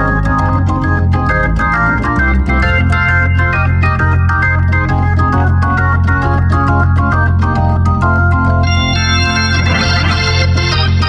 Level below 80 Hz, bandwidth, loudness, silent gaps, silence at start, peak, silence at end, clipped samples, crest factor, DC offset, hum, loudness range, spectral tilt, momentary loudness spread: -20 dBFS; 7 kHz; -12 LUFS; none; 0 s; -2 dBFS; 0 s; under 0.1%; 10 dB; under 0.1%; none; 0 LU; -6 dB/octave; 2 LU